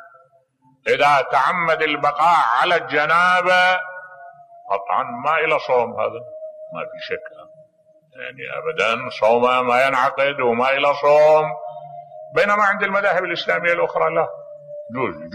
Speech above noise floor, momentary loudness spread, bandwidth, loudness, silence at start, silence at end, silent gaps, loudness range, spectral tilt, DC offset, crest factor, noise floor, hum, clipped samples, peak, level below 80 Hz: 40 dB; 18 LU; 13.5 kHz; -18 LUFS; 0 s; 0 s; none; 7 LU; -4 dB/octave; under 0.1%; 14 dB; -58 dBFS; none; under 0.1%; -4 dBFS; -66 dBFS